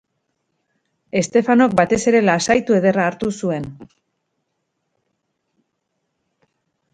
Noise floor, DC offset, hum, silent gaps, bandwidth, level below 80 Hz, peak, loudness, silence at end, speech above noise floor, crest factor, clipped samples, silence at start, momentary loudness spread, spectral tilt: -74 dBFS; under 0.1%; none; none; 9.4 kHz; -56 dBFS; 0 dBFS; -17 LUFS; 3.1 s; 57 dB; 20 dB; under 0.1%; 1.15 s; 10 LU; -5 dB/octave